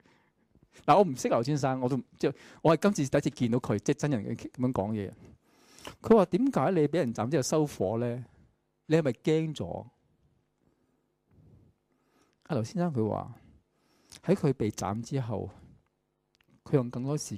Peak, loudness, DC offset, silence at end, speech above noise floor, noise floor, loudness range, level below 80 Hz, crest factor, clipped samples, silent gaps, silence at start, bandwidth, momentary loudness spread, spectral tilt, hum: -10 dBFS; -29 LUFS; under 0.1%; 0 s; 48 dB; -77 dBFS; 9 LU; -62 dBFS; 20 dB; under 0.1%; none; 0.85 s; 15.5 kHz; 13 LU; -6.5 dB/octave; none